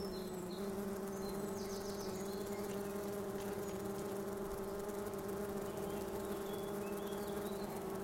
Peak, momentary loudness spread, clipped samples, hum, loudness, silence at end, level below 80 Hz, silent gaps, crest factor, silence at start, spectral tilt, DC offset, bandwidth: -30 dBFS; 1 LU; under 0.1%; none; -43 LUFS; 0 s; -62 dBFS; none; 12 dB; 0 s; -5 dB/octave; under 0.1%; 16.5 kHz